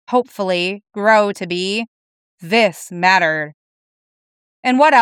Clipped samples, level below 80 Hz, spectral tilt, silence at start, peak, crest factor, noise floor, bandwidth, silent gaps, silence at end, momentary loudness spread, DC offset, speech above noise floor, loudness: under 0.1%; -76 dBFS; -4 dB/octave; 0.1 s; 0 dBFS; 16 dB; under -90 dBFS; 16 kHz; 1.88-2.38 s, 3.54-4.63 s; 0 s; 10 LU; under 0.1%; over 74 dB; -16 LUFS